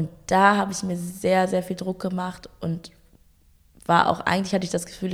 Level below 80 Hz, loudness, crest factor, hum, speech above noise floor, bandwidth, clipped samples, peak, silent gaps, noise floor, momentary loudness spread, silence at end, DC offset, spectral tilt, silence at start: -54 dBFS; -23 LUFS; 22 dB; none; 34 dB; 15.5 kHz; under 0.1%; -2 dBFS; none; -57 dBFS; 12 LU; 0 s; under 0.1%; -5 dB/octave; 0 s